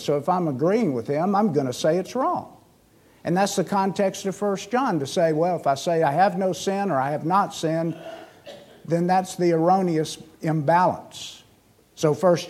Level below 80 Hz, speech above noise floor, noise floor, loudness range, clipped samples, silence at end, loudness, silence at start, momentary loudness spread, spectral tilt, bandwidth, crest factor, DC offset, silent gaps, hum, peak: -68 dBFS; 35 dB; -57 dBFS; 2 LU; under 0.1%; 0 s; -23 LUFS; 0 s; 11 LU; -6 dB/octave; 15 kHz; 18 dB; under 0.1%; none; none; -6 dBFS